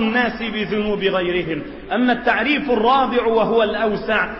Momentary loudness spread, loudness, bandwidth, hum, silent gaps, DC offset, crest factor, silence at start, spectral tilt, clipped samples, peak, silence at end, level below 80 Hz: 7 LU; -19 LUFS; 6 kHz; none; none; under 0.1%; 14 dB; 0 s; -7.5 dB/octave; under 0.1%; -6 dBFS; 0 s; -44 dBFS